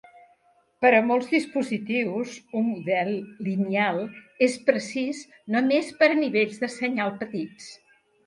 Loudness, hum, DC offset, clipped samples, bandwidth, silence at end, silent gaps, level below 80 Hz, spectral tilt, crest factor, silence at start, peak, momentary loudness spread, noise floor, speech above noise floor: -25 LUFS; none; under 0.1%; under 0.1%; 11.5 kHz; 0.5 s; none; -74 dBFS; -5.5 dB/octave; 20 dB; 0.8 s; -4 dBFS; 12 LU; -64 dBFS; 39 dB